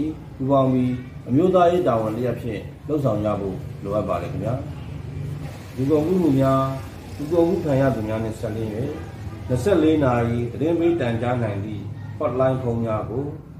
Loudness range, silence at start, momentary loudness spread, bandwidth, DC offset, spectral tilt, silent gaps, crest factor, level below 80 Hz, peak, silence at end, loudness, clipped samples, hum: 4 LU; 0 s; 14 LU; 15.5 kHz; under 0.1%; -8.5 dB/octave; none; 16 dB; -44 dBFS; -6 dBFS; 0 s; -22 LUFS; under 0.1%; none